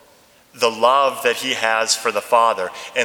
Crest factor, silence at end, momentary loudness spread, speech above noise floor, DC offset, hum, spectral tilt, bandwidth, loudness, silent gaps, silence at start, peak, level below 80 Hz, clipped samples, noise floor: 18 dB; 0 s; 6 LU; 34 dB; under 0.1%; none; -0.5 dB/octave; 19.5 kHz; -18 LUFS; none; 0.55 s; 0 dBFS; -70 dBFS; under 0.1%; -52 dBFS